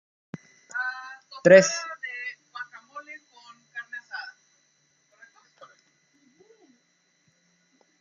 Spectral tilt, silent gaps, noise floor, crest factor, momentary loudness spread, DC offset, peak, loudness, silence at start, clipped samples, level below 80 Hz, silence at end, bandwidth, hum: -4 dB/octave; none; -69 dBFS; 26 dB; 29 LU; under 0.1%; -2 dBFS; -23 LUFS; 0.75 s; under 0.1%; -78 dBFS; 3.7 s; 7.6 kHz; none